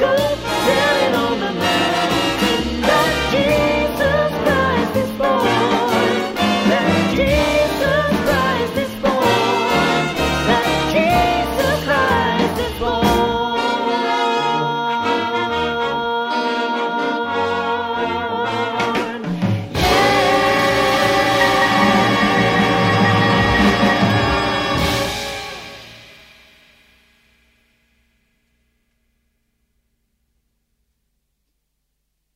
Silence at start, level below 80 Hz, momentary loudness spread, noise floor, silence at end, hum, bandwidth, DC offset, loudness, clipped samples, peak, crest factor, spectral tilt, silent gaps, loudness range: 0 s; -36 dBFS; 6 LU; -72 dBFS; 6.3 s; none; 16 kHz; under 0.1%; -17 LUFS; under 0.1%; -2 dBFS; 16 dB; -5 dB/octave; none; 6 LU